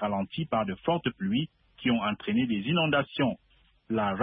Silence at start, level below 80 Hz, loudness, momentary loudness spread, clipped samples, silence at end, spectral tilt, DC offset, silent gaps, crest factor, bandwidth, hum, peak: 0 s; -60 dBFS; -29 LUFS; 6 LU; under 0.1%; 0 s; -10.5 dB/octave; under 0.1%; none; 16 dB; 4.8 kHz; none; -12 dBFS